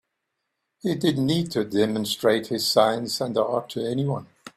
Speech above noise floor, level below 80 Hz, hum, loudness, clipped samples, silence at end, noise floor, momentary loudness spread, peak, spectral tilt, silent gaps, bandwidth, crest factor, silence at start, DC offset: 56 dB; -62 dBFS; none; -24 LUFS; under 0.1%; 0.1 s; -79 dBFS; 8 LU; -4 dBFS; -5 dB/octave; none; 16 kHz; 20 dB; 0.85 s; under 0.1%